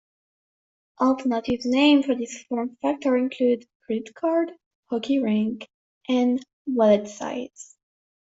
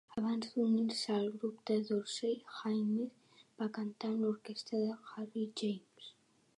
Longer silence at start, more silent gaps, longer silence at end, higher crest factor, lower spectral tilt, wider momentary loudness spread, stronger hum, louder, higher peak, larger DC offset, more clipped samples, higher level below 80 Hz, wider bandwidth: first, 1 s vs 0.1 s; first, 3.75-3.80 s, 4.66-4.83 s, 5.74-6.01 s, 6.53-6.65 s vs none; first, 0.7 s vs 0.45 s; about the same, 18 dB vs 14 dB; about the same, -5 dB/octave vs -5.5 dB/octave; about the same, 12 LU vs 10 LU; neither; first, -24 LUFS vs -38 LUFS; first, -6 dBFS vs -22 dBFS; neither; neither; first, -64 dBFS vs -84 dBFS; second, 8 kHz vs 11.5 kHz